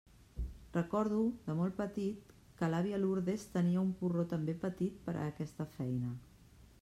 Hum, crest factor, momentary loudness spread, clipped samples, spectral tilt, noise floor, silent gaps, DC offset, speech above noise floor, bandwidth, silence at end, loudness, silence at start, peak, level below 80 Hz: none; 16 dB; 10 LU; under 0.1%; -8 dB/octave; -60 dBFS; none; under 0.1%; 25 dB; 13 kHz; 0.15 s; -37 LUFS; 0.35 s; -22 dBFS; -56 dBFS